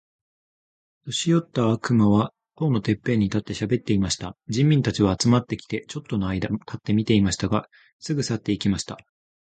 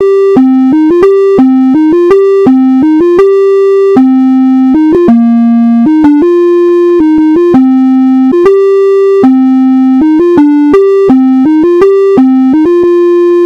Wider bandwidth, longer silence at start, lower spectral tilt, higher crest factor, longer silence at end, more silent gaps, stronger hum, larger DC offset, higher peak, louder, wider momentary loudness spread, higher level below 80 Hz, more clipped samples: first, 9.4 kHz vs 6.4 kHz; first, 1.05 s vs 0 s; second, -6 dB/octave vs -8 dB/octave; first, 18 dB vs 4 dB; first, 0.6 s vs 0 s; first, 7.93-7.99 s vs none; neither; neither; second, -6 dBFS vs 0 dBFS; second, -23 LUFS vs -5 LUFS; first, 10 LU vs 1 LU; about the same, -46 dBFS vs -42 dBFS; second, under 0.1% vs 5%